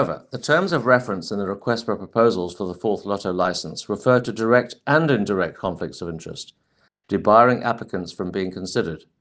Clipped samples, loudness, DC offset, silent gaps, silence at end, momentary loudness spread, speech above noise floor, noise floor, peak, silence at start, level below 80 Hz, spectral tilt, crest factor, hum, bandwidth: under 0.1%; -21 LUFS; under 0.1%; none; 0.2 s; 12 LU; 39 dB; -60 dBFS; 0 dBFS; 0 s; -60 dBFS; -6 dB/octave; 22 dB; none; 9.6 kHz